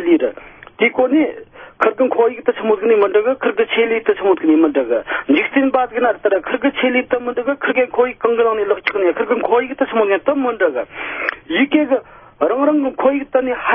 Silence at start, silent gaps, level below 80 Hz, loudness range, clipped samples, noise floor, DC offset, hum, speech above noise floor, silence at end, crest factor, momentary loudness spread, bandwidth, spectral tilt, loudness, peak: 0 s; none; -56 dBFS; 2 LU; under 0.1%; -37 dBFS; under 0.1%; none; 21 dB; 0 s; 16 dB; 6 LU; 5.4 kHz; -7.5 dB/octave; -16 LUFS; 0 dBFS